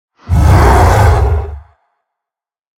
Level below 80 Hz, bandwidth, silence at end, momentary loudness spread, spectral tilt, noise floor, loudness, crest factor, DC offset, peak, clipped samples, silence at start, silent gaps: -16 dBFS; 16.5 kHz; 1.2 s; 10 LU; -6.5 dB/octave; -86 dBFS; -10 LUFS; 10 dB; under 0.1%; 0 dBFS; under 0.1%; 0.25 s; none